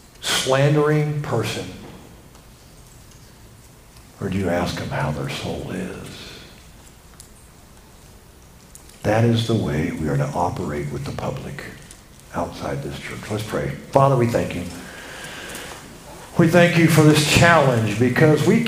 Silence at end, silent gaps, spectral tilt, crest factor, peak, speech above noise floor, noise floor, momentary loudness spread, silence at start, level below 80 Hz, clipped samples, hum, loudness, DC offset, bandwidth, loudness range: 0 s; none; -5.5 dB/octave; 22 dB; 0 dBFS; 27 dB; -46 dBFS; 21 LU; 0.2 s; -44 dBFS; under 0.1%; none; -20 LUFS; under 0.1%; 16 kHz; 14 LU